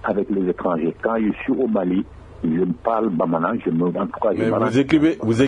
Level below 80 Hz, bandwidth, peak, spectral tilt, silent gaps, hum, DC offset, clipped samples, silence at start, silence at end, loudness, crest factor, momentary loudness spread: -48 dBFS; 10.5 kHz; -4 dBFS; -7.5 dB/octave; none; none; under 0.1%; under 0.1%; 0 s; 0 s; -21 LUFS; 16 dB; 5 LU